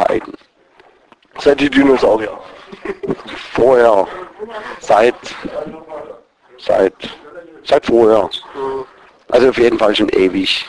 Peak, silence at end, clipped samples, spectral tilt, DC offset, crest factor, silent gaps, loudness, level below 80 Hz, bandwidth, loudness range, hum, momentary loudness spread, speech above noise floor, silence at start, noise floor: 0 dBFS; 0 s; under 0.1%; -5 dB/octave; under 0.1%; 16 dB; none; -14 LUFS; -46 dBFS; 11 kHz; 4 LU; none; 20 LU; 35 dB; 0 s; -49 dBFS